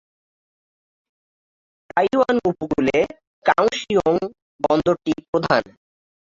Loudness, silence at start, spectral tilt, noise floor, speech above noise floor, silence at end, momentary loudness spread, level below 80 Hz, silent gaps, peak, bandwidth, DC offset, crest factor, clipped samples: -20 LUFS; 1.95 s; -5.5 dB/octave; under -90 dBFS; over 71 dB; 0.75 s; 6 LU; -52 dBFS; 3.27-3.42 s, 4.42-4.59 s, 5.28-5.33 s; -2 dBFS; 7.8 kHz; under 0.1%; 20 dB; under 0.1%